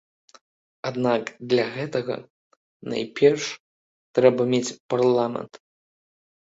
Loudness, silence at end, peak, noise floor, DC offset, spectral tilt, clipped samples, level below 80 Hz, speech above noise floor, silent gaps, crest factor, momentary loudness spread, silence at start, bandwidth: -23 LUFS; 1 s; -2 dBFS; under -90 dBFS; under 0.1%; -5.5 dB/octave; under 0.1%; -68 dBFS; over 67 dB; 2.30-2.51 s, 2.57-2.80 s, 3.60-4.14 s, 4.80-4.89 s; 22 dB; 15 LU; 0.85 s; 8 kHz